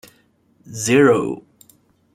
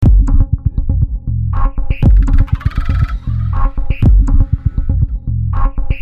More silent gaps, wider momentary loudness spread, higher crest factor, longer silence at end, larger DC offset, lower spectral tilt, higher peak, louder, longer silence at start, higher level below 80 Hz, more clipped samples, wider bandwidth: neither; first, 20 LU vs 7 LU; first, 18 dB vs 10 dB; first, 0.8 s vs 0 s; neither; second, -5 dB/octave vs -9.5 dB/octave; about the same, -2 dBFS vs -2 dBFS; about the same, -17 LUFS vs -16 LUFS; first, 0.7 s vs 0 s; second, -60 dBFS vs -12 dBFS; neither; first, 16 kHz vs 3.9 kHz